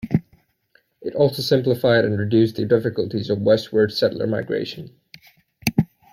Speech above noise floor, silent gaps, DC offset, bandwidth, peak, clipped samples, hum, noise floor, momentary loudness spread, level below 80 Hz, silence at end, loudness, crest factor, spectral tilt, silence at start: 43 dB; none; under 0.1%; 16.5 kHz; -2 dBFS; under 0.1%; none; -62 dBFS; 9 LU; -54 dBFS; 0.3 s; -20 LUFS; 18 dB; -6.5 dB/octave; 0.05 s